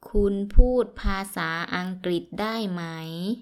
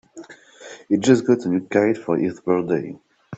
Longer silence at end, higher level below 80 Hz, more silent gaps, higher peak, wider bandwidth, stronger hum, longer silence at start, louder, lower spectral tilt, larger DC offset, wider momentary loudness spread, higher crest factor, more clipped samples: about the same, 0 s vs 0 s; first, -26 dBFS vs -62 dBFS; neither; about the same, 0 dBFS vs -2 dBFS; first, 13 kHz vs 8.2 kHz; neither; about the same, 0.05 s vs 0.15 s; second, -27 LUFS vs -20 LUFS; about the same, -6 dB/octave vs -6.5 dB/octave; neither; second, 8 LU vs 15 LU; about the same, 22 dB vs 20 dB; neither